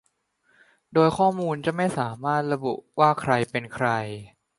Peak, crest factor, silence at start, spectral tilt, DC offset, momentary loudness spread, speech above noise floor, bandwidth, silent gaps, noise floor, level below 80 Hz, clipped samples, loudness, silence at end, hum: -4 dBFS; 20 dB; 0.9 s; -6.5 dB/octave; under 0.1%; 9 LU; 45 dB; 11.5 kHz; none; -68 dBFS; -60 dBFS; under 0.1%; -24 LUFS; 0.3 s; none